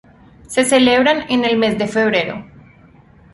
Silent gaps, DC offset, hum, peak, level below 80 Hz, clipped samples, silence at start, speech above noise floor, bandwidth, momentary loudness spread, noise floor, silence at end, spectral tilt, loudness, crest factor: none; under 0.1%; none; -2 dBFS; -50 dBFS; under 0.1%; 0.5 s; 31 dB; 11.5 kHz; 9 LU; -46 dBFS; 0.9 s; -3.5 dB/octave; -15 LUFS; 16 dB